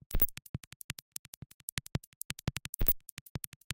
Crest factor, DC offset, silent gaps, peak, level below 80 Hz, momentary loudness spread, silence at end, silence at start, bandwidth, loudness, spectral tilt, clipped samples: 26 dB; under 0.1%; 0.49-0.54 s, 0.67-0.89 s, 1.02-1.12 s, 1.19-1.77 s, 2.07-2.30 s, 2.69-2.73 s, 3.12-3.35 s, 3.47-3.70 s; -10 dBFS; -42 dBFS; 16 LU; 0 s; 0.1 s; 17 kHz; -35 LUFS; -3.5 dB/octave; under 0.1%